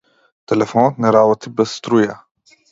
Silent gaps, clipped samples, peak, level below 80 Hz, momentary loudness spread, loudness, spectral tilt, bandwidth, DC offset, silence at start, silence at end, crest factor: none; under 0.1%; 0 dBFS; -60 dBFS; 7 LU; -16 LUFS; -6.5 dB/octave; 7.8 kHz; under 0.1%; 0.5 s; 0.55 s; 16 dB